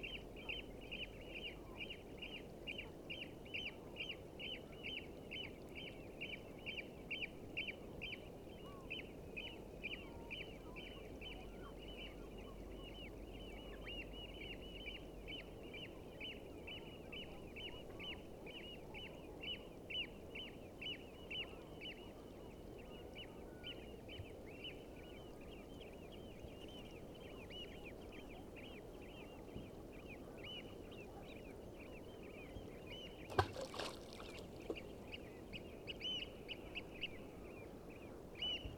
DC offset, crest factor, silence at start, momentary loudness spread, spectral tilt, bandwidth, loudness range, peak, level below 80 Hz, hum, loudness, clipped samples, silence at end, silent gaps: under 0.1%; 32 dB; 0 s; 9 LU; -4.5 dB/octave; 19.5 kHz; 6 LU; -18 dBFS; -62 dBFS; none; -50 LUFS; under 0.1%; 0 s; none